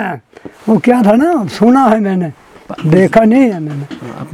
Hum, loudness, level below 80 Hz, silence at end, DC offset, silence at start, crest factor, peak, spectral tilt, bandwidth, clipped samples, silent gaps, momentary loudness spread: none; -11 LUFS; -46 dBFS; 0 s; under 0.1%; 0 s; 12 dB; 0 dBFS; -8 dB/octave; 12.5 kHz; 0.5%; none; 16 LU